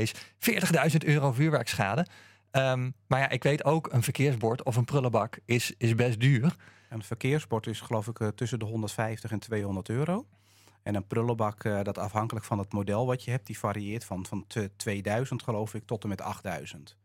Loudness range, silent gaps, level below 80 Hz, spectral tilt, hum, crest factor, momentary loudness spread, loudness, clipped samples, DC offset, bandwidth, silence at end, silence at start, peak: 6 LU; none; -66 dBFS; -6 dB/octave; none; 22 dB; 11 LU; -30 LUFS; under 0.1%; under 0.1%; 16.5 kHz; 0.15 s; 0 s; -6 dBFS